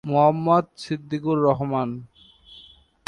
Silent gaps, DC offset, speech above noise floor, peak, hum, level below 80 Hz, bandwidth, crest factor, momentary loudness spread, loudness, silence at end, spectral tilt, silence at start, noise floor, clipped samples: none; under 0.1%; 29 dB; -6 dBFS; none; -58 dBFS; 11.5 kHz; 18 dB; 12 LU; -22 LUFS; 0.5 s; -8 dB/octave; 0.05 s; -51 dBFS; under 0.1%